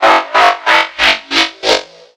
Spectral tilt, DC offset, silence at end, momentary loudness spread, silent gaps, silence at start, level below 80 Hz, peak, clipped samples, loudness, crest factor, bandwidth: -0.5 dB/octave; under 0.1%; 0.35 s; 5 LU; none; 0 s; -46 dBFS; 0 dBFS; 0.2%; -11 LUFS; 12 dB; 17 kHz